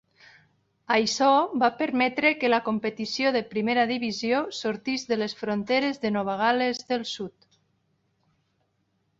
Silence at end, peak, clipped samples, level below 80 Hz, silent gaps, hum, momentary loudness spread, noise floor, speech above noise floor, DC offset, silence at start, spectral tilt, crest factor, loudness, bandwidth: 1.9 s; -8 dBFS; under 0.1%; -70 dBFS; none; none; 8 LU; -72 dBFS; 47 dB; under 0.1%; 0.9 s; -4 dB/octave; 20 dB; -25 LUFS; 8 kHz